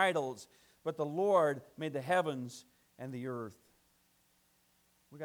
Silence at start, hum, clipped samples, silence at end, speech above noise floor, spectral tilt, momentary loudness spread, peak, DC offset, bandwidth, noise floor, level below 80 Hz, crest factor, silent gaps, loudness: 0 s; none; under 0.1%; 0 s; 38 dB; -5.5 dB/octave; 19 LU; -16 dBFS; under 0.1%; 19.5 kHz; -72 dBFS; -82 dBFS; 20 dB; none; -35 LUFS